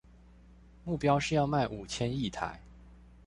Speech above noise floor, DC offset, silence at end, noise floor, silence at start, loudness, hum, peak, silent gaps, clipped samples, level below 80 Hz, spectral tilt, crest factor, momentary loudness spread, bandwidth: 26 dB; under 0.1%; 0.15 s; -56 dBFS; 0.5 s; -32 LUFS; none; -14 dBFS; none; under 0.1%; -52 dBFS; -5.5 dB/octave; 20 dB; 12 LU; 11 kHz